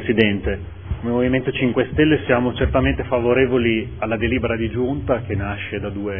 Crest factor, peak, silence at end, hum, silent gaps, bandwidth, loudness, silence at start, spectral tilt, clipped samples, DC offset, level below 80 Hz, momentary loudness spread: 20 dB; 0 dBFS; 0 s; none; none; 3.6 kHz; -20 LUFS; 0 s; -10 dB/octave; under 0.1%; 0.5%; -34 dBFS; 9 LU